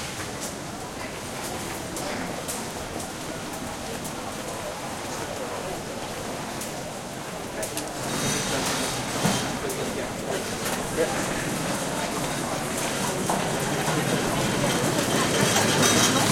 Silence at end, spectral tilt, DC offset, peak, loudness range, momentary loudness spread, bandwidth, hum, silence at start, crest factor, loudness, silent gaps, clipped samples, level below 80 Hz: 0 s; -3 dB/octave; under 0.1%; -6 dBFS; 8 LU; 11 LU; 16.5 kHz; none; 0 s; 20 dB; -27 LUFS; none; under 0.1%; -50 dBFS